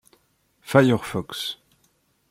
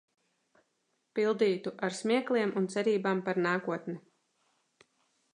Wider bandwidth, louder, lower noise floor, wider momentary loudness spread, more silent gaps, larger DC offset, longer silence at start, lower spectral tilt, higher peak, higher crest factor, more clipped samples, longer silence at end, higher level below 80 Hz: first, 16.5 kHz vs 11 kHz; first, -22 LUFS vs -31 LUFS; second, -66 dBFS vs -78 dBFS; first, 13 LU vs 10 LU; neither; neither; second, 0.65 s vs 1.15 s; about the same, -6 dB/octave vs -5.5 dB/octave; first, -2 dBFS vs -16 dBFS; about the same, 22 dB vs 18 dB; neither; second, 0.75 s vs 1.35 s; first, -60 dBFS vs -84 dBFS